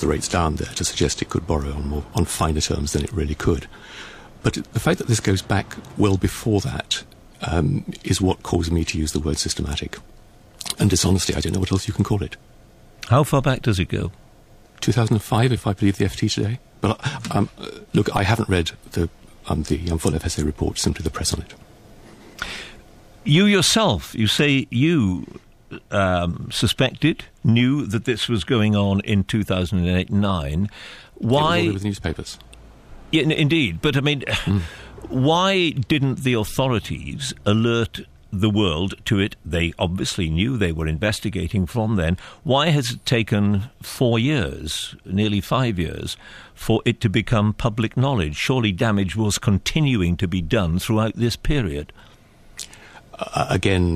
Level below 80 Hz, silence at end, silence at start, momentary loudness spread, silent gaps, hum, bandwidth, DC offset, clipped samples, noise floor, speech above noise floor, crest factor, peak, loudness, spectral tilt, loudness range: -36 dBFS; 0 s; 0 s; 12 LU; none; none; 15.5 kHz; under 0.1%; under 0.1%; -49 dBFS; 28 dB; 16 dB; -4 dBFS; -21 LUFS; -5 dB/octave; 3 LU